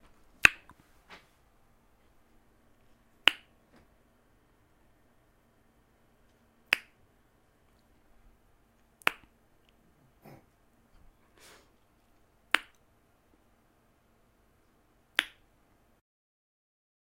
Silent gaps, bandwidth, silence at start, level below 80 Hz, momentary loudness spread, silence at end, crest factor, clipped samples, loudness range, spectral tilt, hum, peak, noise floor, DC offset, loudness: none; 16 kHz; 0.45 s; -64 dBFS; 31 LU; 1.75 s; 40 dB; under 0.1%; 5 LU; -0.5 dB/octave; none; 0 dBFS; -67 dBFS; under 0.1%; -28 LUFS